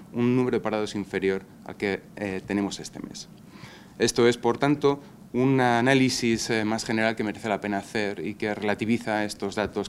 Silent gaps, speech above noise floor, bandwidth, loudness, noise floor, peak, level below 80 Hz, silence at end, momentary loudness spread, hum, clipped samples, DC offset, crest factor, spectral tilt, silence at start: none; 20 dB; 15 kHz; -26 LUFS; -46 dBFS; -4 dBFS; -58 dBFS; 0 s; 15 LU; none; under 0.1%; under 0.1%; 22 dB; -5 dB/octave; 0 s